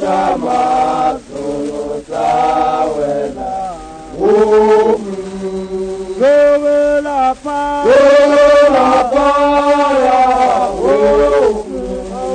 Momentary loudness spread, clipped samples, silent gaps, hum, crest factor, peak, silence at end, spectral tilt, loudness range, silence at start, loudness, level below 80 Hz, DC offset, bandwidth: 14 LU; under 0.1%; none; none; 12 dB; 0 dBFS; 0 s; -5 dB/octave; 6 LU; 0 s; -12 LUFS; -38 dBFS; under 0.1%; 9.6 kHz